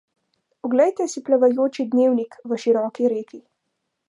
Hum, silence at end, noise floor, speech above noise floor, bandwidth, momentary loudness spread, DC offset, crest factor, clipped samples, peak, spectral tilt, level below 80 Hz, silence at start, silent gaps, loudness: none; 0.7 s; -77 dBFS; 57 dB; 11 kHz; 10 LU; under 0.1%; 16 dB; under 0.1%; -6 dBFS; -5 dB/octave; -80 dBFS; 0.65 s; none; -21 LUFS